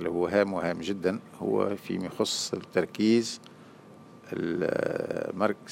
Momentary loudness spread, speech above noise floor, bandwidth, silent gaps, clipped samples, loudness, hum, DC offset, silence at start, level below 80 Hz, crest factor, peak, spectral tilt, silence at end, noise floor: 9 LU; 22 dB; 16 kHz; none; under 0.1%; -29 LUFS; none; under 0.1%; 0 s; -66 dBFS; 20 dB; -10 dBFS; -4.5 dB/octave; 0 s; -50 dBFS